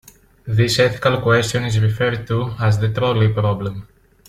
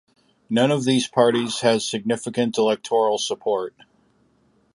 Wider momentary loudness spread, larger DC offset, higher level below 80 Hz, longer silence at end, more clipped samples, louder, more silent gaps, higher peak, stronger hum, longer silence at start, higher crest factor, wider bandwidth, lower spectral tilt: about the same, 8 LU vs 6 LU; neither; first, -44 dBFS vs -68 dBFS; second, 0.45 s vs 1.05 s; neither; first, -18 LUFS vs -21 LUFS; neither; about the same, -2 dBFS vs -4 dBFS; neither; about the same, 0.45 s vs 0.5 s; about the same, 16 dB vs 18 dB; first, 14 kHz vs 11.5 kHz; about the same, -5.5 dB/octave vs -4.5 dB/octave